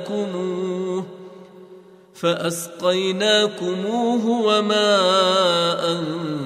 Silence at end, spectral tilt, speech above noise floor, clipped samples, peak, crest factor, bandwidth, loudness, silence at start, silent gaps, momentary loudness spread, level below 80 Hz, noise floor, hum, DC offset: 0 s; -4 dB/octave; 25 dB; under 0.1%; -6 dBFS; 14 dB; 15 kHz; -20 LUFS; 0 s; none; 10 LU; -72 dBFS; -46 dBFS; none; under 0.1%